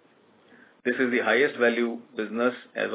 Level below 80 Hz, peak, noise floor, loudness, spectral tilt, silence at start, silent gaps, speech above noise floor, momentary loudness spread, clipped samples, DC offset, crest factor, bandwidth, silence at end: -88 dBFS; -10 dBFS; -59 dBFS; -25 LUFS; -8 dB/octave; 0.85 s; none; 34 dB; 11 LU; under 0.1%; under 0.1%; 18 dB; 4 kHz; 0 s